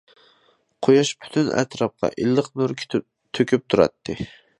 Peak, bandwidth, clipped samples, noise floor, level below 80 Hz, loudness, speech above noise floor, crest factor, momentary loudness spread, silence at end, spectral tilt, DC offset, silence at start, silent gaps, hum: -2 dBFS; 11 kHz; under 0.1%; -62 dBFS; -54 dBFS; -22 LUFS; 41 dB; 20 dB; 11 LU; 0.35 s; -5.5 dB/octave; under 0.1%; 0.8 s; none; none